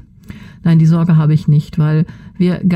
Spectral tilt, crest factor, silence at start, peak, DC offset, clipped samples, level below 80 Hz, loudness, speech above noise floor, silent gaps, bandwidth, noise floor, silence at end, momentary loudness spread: -9.5 dB/octave; 10 dB; 0.3 s; -2 dBFS; under 0.1%; under 0.1%; -44 dBFS; -13 LUFS; 23 dB; none; 6.4 kHz; -35 dBFS; 0 s; 7 LU